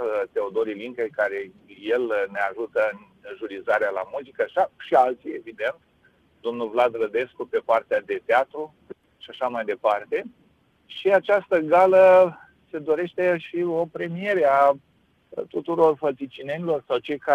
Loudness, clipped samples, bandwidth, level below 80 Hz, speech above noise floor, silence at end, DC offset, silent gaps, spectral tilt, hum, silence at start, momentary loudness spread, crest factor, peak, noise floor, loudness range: -23 LUFS; under 0.1%; 8 kHz; -68 dBFS; 39 dB; 0 s; under 0.1%; none; -6.5 dB/octave; none; 0 s; 16 LU; 18 dB; -6 dBFS; -61 dBFS; 6 LU